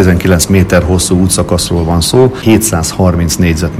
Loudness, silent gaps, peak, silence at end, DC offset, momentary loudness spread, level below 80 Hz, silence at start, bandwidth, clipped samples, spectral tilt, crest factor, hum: -9 LUFS; none; 0 dBFS; 0 s; under 0.1%; 3 LU; -24 dBFS; 0 s; 16 kHz; 1%; -5 dB/octave; 8 dB; none